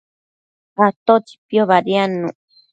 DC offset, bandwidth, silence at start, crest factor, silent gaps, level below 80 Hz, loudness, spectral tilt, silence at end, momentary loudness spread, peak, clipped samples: under 0.1%; 9 kHz; 0.8 s; 18 dB; 0.96-1.06 s, 1.38-1.49 s; -68 dBFS; -17 LUFS; -7 dB/octave; 0.4 s; 11 LU; 0 dBFS; under 0.1%